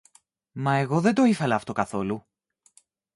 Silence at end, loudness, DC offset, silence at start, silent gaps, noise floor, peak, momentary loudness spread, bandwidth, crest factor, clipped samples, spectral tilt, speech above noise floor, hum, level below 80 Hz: 0.95 s; -24 LUFS; under 0.1%; 0.55 s; none; -61 dBFS; -6 dBFS; 12 LU; 11.5 kHz; 20 dB; under 0.1%; -6.5 dB/octave; 38 dB; none; -62 dBFS